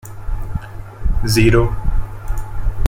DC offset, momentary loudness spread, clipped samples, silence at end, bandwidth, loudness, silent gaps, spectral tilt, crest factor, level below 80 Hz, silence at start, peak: under 0.1%; 16 LU; under 0.1%; 0 s; 16.5 kHz; -20 LUFS; none; -6 dB/octave; 14 dB; -20 dBFS; 0.05 s; -2 dBFS